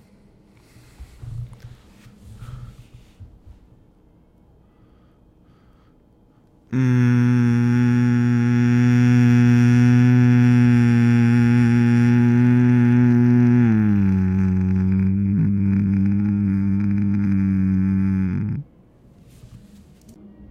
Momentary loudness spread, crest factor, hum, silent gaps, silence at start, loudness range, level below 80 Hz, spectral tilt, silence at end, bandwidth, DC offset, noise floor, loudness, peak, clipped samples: 8 LU; 14 dB; none; none; 1 s; 8 LU; -48 dBFS; -9 dB/octave; 1.05 s; 7 kHz; under 0.1%; -54 dBFS; -17 LUFS; -4 dBFS; under 0.1%